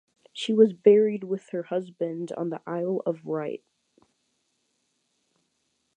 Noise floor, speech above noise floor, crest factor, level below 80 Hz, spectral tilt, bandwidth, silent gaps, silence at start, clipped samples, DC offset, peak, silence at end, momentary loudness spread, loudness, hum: -75 dBFS; 50 dB; 22 dB; -84 dBFS; -7 dB/octave; 9.4 kHz; none; 0.35 s; under 0.1%; under 0.1%; -6 dBFS; 2.4 s; 14 LU; -26 LUFS; none